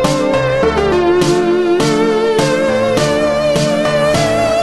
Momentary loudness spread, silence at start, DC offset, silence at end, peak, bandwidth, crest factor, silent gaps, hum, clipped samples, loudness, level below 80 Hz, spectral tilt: 1 LU; 0 s; 0.9%; 0 s; -2 dBFS; 12.5 kHz; 12 dB; none; none; under 0.1%; -13 LUFS; -36 dBFS; -5 dB/octave